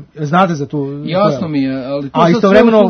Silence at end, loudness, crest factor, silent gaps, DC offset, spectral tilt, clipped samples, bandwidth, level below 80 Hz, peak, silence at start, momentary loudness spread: 0 s; -13 LUFS; 12 dB; none; under 0.1%; -7.5 dB/octave; 0.3%; 6.6 kHz; -46 dBFS; 0 dBFS; 0 s; 11 LU